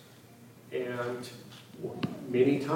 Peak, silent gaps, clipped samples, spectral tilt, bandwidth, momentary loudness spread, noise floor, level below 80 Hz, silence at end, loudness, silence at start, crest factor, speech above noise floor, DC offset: -12 dBFS; none; under 0.1%; -6.5 dB/octave; 17 kHz; 27 LU; -54 dBFS; -76 dBFS; 0 s; -33 LUFS; 0 s; 20 dB; 23 dB; under 0.1%